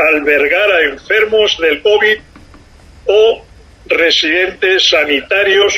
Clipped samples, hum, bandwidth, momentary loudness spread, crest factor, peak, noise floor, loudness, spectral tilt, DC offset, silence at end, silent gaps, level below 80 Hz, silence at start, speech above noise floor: under 0.1%; none; 14 kHz; 4 LU; 12 dB; 0 dBFS; -39 dBFS; -11 LUFS; -1.5 dB/octave; under 0.1%; 0 s; none; -44 dBFS; 0 s; 28 dB